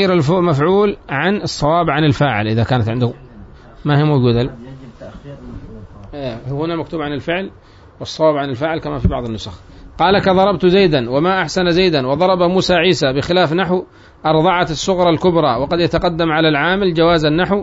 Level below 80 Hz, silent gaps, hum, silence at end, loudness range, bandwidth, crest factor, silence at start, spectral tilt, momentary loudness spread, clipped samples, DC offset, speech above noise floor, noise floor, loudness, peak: -36 dBFS; none; none; 0 s; 8 LU; 8 kHz; 14 dB; 0 s; -6 dB/octave; 15 LU; under 0.1%; under 0.1%; 23 dB; -38 dBFS; -15 LUFS; -2 dBFS